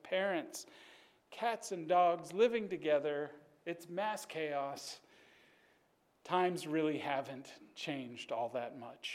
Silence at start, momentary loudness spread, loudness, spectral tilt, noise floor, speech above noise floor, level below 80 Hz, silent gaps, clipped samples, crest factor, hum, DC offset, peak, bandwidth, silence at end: 0.05 s; 16 LU; -37 LUFS; -4.5 dB/octave; -74 dBFS; 37 dB; -88 dBFS; none; under 0.1%; 18 dB; none; under 0.1%; -20 dBFS; 16 kHz; 0 s